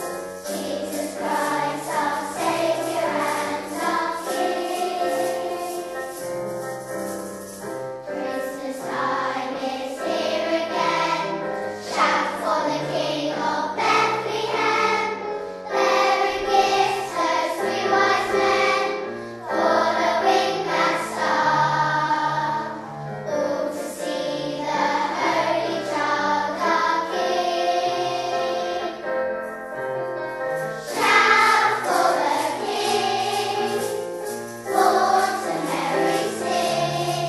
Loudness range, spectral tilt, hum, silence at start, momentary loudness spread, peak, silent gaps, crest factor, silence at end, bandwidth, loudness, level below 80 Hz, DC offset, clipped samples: 7 LU; -3.5 dB/octave; none; 0 s; 11 LU; -2 dBFS; none; 20 dB; 0 s; 13 kHz; -23 LUFS; -62 dBFS; under 0.1%; under 0.1%